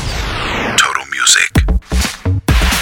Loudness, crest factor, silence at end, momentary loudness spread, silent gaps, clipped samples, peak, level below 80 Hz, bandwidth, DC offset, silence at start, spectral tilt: -13 LUFS; 14 dB; 0 s; 9 LU; none; under 0.1%; 0 dBFS; -18 dBFS; 17.5 kHz; under 0.1%; 0 s; -2.5 dB/octave